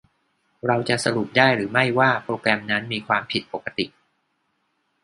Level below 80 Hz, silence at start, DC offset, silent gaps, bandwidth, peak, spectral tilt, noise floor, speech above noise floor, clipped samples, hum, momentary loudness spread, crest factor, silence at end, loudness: -62 dBFS; 0.65 s; under 0.1%; none; 11.5 kHz; 0 dBFS; -4.5 dB/octave; -71 dBFS; 49 dB; under 0.1%; none; 11 LU; 24 dB; 1.15 s; -22 LUFS